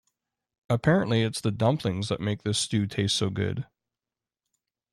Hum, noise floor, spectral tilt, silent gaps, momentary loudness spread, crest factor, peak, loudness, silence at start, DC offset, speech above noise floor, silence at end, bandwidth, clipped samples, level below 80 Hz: none; under -90 dBFS; -5 dB/octave; none; 7 LU; 18 dB; -10 dBFS; -27 LUFS; 0.7 s; under 0.1%; over 64 dB; 1.3 s; 13 kHz; under 0.1%; -58 dBFS